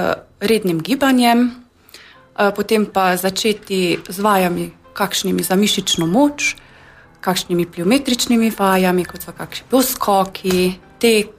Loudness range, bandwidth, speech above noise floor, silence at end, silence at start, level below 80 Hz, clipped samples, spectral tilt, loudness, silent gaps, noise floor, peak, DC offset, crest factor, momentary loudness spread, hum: 1 LU; 15.5 kHz; 28 dB; 0.1 s; 0 s; -50 dBFS; under 0.1%; -4 dB/octave; -17 LUFS; none; -45 dBFS; -2 dBFS; under 0.1%; 14 dB; 8 LU; none